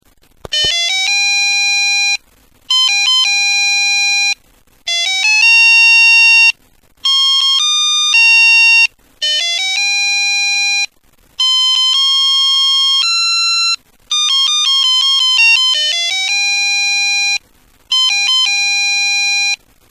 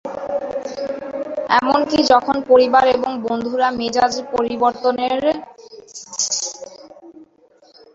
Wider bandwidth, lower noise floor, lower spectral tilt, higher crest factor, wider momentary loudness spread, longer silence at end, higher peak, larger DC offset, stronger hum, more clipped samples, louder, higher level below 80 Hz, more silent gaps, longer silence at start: first, 15.5 kHz vs 7.8 kHz; about the same, -50 dBFS vs -53 dBFS; second, 4 dB/octave vs -2.5 dB/octave; second, 12 dB vs 18 dB; second, 10 LU vs 13 LU; second, 0.35 s vs 0.7 s; about the same, 0 dBFS vs 0 dBFS; neither; neither; neither; first, -9 LUFS vs -18 LUFS; about the same, -54 dBFS vs -54 dBFS; neither; first, 0.5 s vs 0.05 s